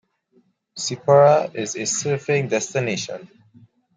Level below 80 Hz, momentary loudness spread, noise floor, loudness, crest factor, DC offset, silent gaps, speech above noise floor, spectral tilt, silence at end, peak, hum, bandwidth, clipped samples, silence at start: -68 dBFS; 15 LU; -62 dBFS; -20 LUFS; 18 dB; under 0.1%; none; 42 dB; -4 dB/octave; 0.7 s; -4 dBFS; none; 9.6 kHz; under 0.1%; 0.75 s